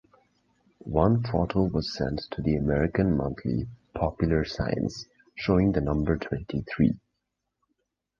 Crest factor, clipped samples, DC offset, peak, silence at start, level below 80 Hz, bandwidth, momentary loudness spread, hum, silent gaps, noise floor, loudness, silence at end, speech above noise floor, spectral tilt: 20 dB; under 0.1%; under 0.1%; -6 dBFS; 0.85 s; -40 dBFS; 7.4 kHz; 9 LU; none; none; -82 dBFS; -27 LUFS; 1.2 s; 56 dB; -8 dB/octave